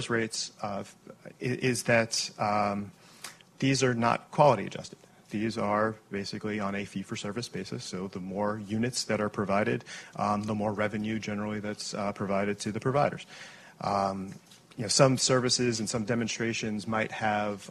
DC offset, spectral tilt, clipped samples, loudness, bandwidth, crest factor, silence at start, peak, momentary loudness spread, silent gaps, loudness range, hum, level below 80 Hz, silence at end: under 0.1%; -4.5 dB/octave; under 0.1%; -30 LUFS; 13 kHz; 22 dB; 0 s; -8 dBFS; 15 LU; none; 5 LU; none; -62 dBFS; 0 s